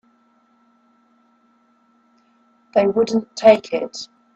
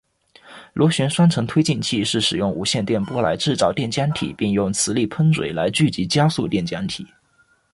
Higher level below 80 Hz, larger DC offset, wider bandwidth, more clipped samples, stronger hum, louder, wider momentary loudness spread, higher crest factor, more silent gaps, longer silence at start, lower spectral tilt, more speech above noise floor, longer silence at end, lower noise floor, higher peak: second, -64 dBFS vs -50 dBFS; neither; second, 8.2 kHz vs 11.5 kHz; neither; neither; about the same, -18 LUFS vs -20 LUFS; first, 14 LU vs 6 LU; first, 22 dB vs 16 dB; neither; first, 2.75 s vs 0.45 s; about the same, -5 dB/octave vs -5 dB/octave; about the same, 43 dB vs 40 dB; second, 0.3 s vs 0.65 s; about the same, -59 dBFS vs -60 dBFS; first, 0 dBFS vs -4 dBFS